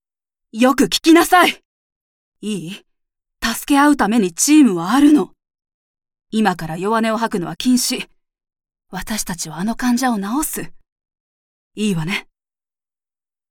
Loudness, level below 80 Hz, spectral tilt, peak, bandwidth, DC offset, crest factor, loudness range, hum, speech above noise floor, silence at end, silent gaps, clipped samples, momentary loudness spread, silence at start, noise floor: -16 LUFS; -46 dBFS; -3.5 dB/octave; -2 dBFS; 18 kHz; under 0.1%; 18 dB; 7 LU; none; over 74 dB; 1.3 s; 1.65-2.32 s, 5.74-5.94 s, 10.92-10.96 s, 11.20-11.71 s; under 0.1%; 16 LU; 0.55 s; under -90 dBFS